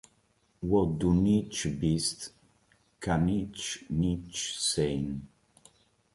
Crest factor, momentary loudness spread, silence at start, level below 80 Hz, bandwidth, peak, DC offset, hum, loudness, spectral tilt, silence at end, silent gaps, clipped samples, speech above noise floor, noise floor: 18 dB; 12 LU; 0.6 s; -48 dBFS; 11.5 kHz; -14 dBFS; under 0.1%; none; -30 LUFS; -5 dB/octave; 0.9 s; none; under 0.1%; 41 dB; -69 dBFS